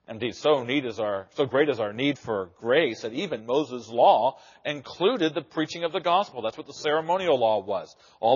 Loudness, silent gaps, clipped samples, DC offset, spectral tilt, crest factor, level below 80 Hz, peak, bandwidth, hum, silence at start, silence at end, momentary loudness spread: -26 LUFS; none; under 0.1%; under 0.1%; -3 dB/octave; 18 dB; -70 dBFS; -8 dBFS; 7.2 kHz; none; 0.1 s; 0 s; 10 LU